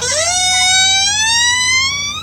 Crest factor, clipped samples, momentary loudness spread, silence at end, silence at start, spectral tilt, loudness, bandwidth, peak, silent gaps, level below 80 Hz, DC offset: 12 dB; under 0.1%; 4 LU; 0 s; 0 s; 1 dB/octave; -10 LUFS; 16 kHz; 0 dBFS; none; -44 dBFS; under 0.1%